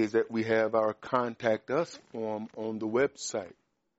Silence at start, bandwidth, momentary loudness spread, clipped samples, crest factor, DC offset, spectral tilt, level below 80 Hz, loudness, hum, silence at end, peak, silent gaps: 0 s; 8 kHz; 10 LU; under 0.1%; 18 dB; under 0.1%; -4.5 dB/octave; -72 dBFS; -31 LUFS; none; 0.45 s; -12 dBFS; none